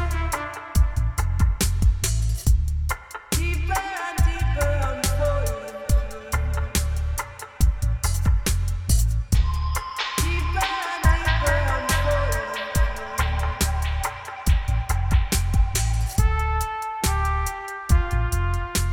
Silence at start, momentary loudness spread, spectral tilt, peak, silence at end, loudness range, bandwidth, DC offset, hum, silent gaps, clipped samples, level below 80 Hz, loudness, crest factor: 0 s; 6 LU; -4.5 dB/octave; -4 dBFS; 0 s; 2 LU; 19.5 kHz; under 0.1%; none; none; under 0.1%; -24 dBFS; -24 LUFS; 18 dB